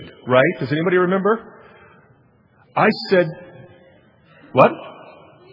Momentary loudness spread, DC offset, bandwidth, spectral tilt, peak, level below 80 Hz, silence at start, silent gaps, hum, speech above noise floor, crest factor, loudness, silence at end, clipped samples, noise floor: 11 LU; under 0.1%; 6 kHz; -8.5 dB/octave; 0 dBFS; -66 dBFS; 0 s; none; none; 38 dB; 20 dB; -18 LUFS; 0.6 s; under 0.1%; -55 dBFS